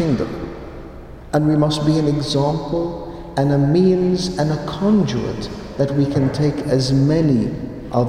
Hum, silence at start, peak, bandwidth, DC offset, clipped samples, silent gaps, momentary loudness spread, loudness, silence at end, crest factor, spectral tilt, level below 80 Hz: none; 0 s; -4 dBFS; 11 kHz; under 0.1%; under 0.1%; none; 14 LU; -18 LUFS; 0 s; 14 dB; -7 dB/octave; -38 dBFS